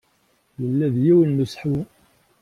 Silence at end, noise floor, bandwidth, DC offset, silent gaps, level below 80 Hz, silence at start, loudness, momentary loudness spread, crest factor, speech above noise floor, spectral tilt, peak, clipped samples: 0.55 s; -64 dBFS; 11.5 kHz; under 0.1%; none; -56 dBFS; 0.6 s; -20 LUFS; 13 LU; 14 dB; 45 dB; -9 dB/octave; -6 dBFS; under 0.1%